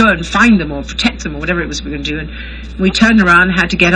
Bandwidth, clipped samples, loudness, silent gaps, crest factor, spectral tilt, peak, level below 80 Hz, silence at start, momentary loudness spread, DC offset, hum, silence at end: 10 kHz; 0.1%; -12 LUFS; none; 12 dB; -5 dB/octave; 0 dBFS; -28 dBFS; 0 s; 13 LU; under 0.1%; none; 0 s